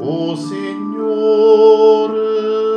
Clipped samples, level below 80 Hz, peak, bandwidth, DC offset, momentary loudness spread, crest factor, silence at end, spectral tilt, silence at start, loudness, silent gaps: under 0.1%; -84 dBFS; 0 dBFS; 9 kHz; under 0.1%; 14 LU; 12 dB; 0 s; -7 dB/octave; 0 s; -13 LUFS; none